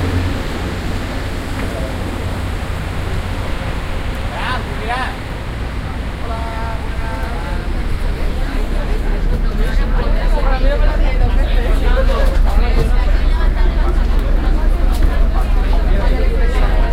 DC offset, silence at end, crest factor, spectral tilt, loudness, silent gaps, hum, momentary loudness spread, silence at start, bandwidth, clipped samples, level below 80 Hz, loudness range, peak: under 0.1%; 0 s; 14 dB; -6.5 dB/octave; -19 LUFS; none; none; 6 LU; 0 s; 11 kHz; under 0.1%; -16 dBFS; 5 LU; 0 dBFS